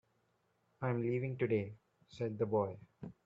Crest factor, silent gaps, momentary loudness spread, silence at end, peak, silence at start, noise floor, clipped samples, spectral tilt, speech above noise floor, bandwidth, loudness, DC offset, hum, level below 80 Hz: 18 dB; none; 12 LU; 0.15 s; -22 dBFS; 0.8 s; -78 dBFS; under 0.1%; -9.5 dB/octave; 41 dB; 7.6 kHz; -38 LUFS; under 0.1%; none; -74 dBFS